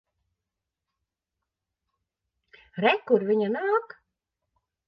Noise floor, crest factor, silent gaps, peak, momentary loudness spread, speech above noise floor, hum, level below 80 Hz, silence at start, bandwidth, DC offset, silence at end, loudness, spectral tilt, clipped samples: -86 dBFS; 22 dB; none; -8 dBFS; 5 LU; 62 dB; none; -76 dBFS; 2.75 s; 5.8 kHz; under 0.1%; 1.05 s; -25 LUFS; -8 dB/octave; under 0.1%